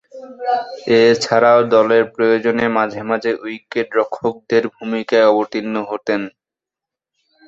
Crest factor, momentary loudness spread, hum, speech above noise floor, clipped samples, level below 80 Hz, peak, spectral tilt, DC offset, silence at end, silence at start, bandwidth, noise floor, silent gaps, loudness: 16 dB; 11 LU; none; 71 dB; under 0.1%; -62 dBFS; -2 dBFS; -5 dB/octave; under 0.1%; 1.2 s; 0.15 s; 8 kHz; -86 dBFS; none; -16 LUFS